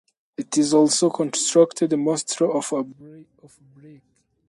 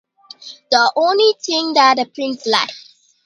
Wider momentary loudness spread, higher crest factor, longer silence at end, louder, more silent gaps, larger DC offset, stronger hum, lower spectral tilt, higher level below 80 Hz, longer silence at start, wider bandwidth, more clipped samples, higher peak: second, 12 LU vs 17 LU; about the same, 20 dB vs 18 dB; about the same, 0.6 s vs 0.5 s; second, -20 LUFS vs -15 LUFS; neither; neither; neither; first, -4 dB/octave vs -1.5 dB/octave; about the same, -70 dBFS vs -68 dBFS; about the same, 0.4 s vs 0.4 s; about the same, 11.5 kHz vs 11 kHz; neither; second, -4 dBFS vs 0 dBFS